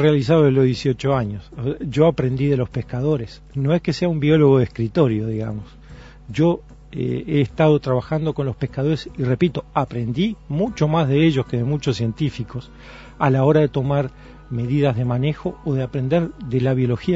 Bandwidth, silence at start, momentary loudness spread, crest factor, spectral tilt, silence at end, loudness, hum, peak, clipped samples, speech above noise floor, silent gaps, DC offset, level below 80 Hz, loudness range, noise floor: 8 kHz; 0 s; 11 LU; 18 dB; -8 dB/octave; 0 s; -20 LUFS; none; -2 dBFS; under 0.1%; 21 dB; none; under 0.1%; -44 dBFS; 2 LU; -41 dBFS